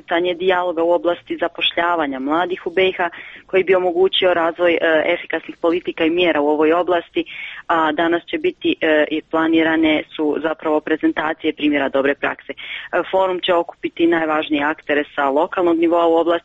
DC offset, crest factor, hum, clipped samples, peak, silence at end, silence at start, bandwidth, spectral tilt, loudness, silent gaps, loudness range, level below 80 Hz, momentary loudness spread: under 0.1%; 14 dB; none; under 0.1%; -4 dBFS; 0.05 s; 0.1 s; 4.4 kHz; -6.5 dB/octave; -18 LUFS; none; 2 LU; -56 dBFS; 7 LU